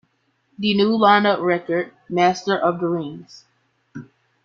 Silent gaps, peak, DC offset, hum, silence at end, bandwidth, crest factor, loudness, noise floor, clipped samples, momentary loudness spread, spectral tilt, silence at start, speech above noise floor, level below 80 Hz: none; -2 dBFS; under 0.1%; none; 0.4 s; 7.4 kHz; 20 dB; -19 LUFS; -66 dBFS; under 0.1%; 25 LU; -5.5 dB/octave; 0.6 s; 47 dB; -64 dBFS